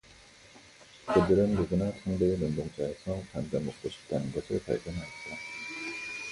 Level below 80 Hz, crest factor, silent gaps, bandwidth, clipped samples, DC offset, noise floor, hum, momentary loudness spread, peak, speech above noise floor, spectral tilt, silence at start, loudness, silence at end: -50 dBFS; 22 dB; none; 11.5 kHz; under 0.1%; under 0.1%; -55 dBFS; none; 13 LU; -10 dBFS; 25 dB; -6.5 dB/octave; 0.1 s; -32 LUFS; 0 s